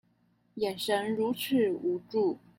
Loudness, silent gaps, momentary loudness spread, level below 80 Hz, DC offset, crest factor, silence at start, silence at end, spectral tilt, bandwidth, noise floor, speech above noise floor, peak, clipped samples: -30 LUFS; none; 7 LU; -74 dBFS; under 0.1%; 14 dB; 0.55 s; 0.2 s; -5 dB/octave; 16.5 kHz; -69 dBFS; 40 dB; -16 dBFS; under 0.1%